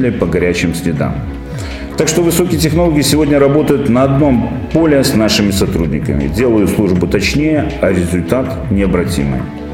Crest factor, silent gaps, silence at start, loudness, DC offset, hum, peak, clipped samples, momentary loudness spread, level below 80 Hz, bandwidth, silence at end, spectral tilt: 12 dB; none; 0 s; -13 LUFS; under 0.1%; none; 0 dBFS; under 0.1%; 7 LU; -26 dBFS; 17 kHz; 0 s; -5.5 dB/octave